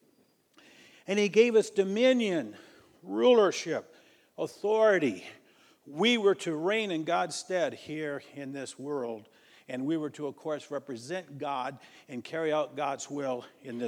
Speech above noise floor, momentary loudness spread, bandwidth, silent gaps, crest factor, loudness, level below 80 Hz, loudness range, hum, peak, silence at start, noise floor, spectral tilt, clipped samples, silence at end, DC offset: 38 dB; 16 LU; 12.5 kHz; none; 20 dB; -29 LUFS; -86 dBFS; 10 LU; none; -10 dBFS; 1.1 s; -67 dBFS; -4.5 dB/octave; under 0.1%; 0 s; under 0.1%